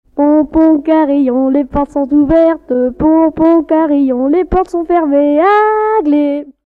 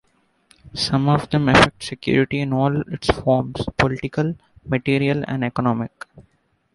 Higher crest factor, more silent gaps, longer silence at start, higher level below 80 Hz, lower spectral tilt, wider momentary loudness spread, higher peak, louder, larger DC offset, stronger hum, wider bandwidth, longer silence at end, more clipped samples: second, 10 dB vs 20 dB; neither; second, 0.15 s vs 0.65 s; first, -34 dBFS vs -42 dBFS; first, -8.5 dB/octave vs -6 dB/octave; second, 5 LU vs 11 LU; about the same, -2 dBFS vs 0 dBFS; first, -11 LUFS vs -20 LUFS; neither; neither; second, 4.5 kHz vs 11.5 kHz; second, 0.15 s vs 0.55 s; neither